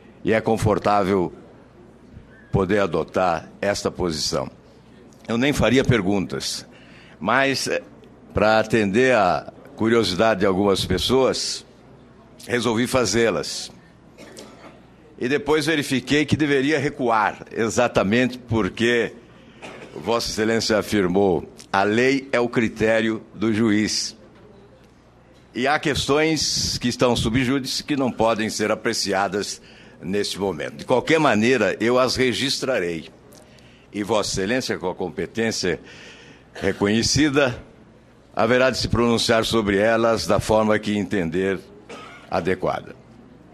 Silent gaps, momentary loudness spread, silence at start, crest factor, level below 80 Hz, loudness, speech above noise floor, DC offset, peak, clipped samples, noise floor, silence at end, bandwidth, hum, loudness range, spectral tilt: none; 12 LU; 0.25 s; 20 dB; -46 dBFS; -21 LUFS; 30 dB; under 0.1%; -2 dBFS; under 0.1%; -51 dBFS; 0.6 s; 13.5 kHz; none; 4 LU; -4.5 dB/octave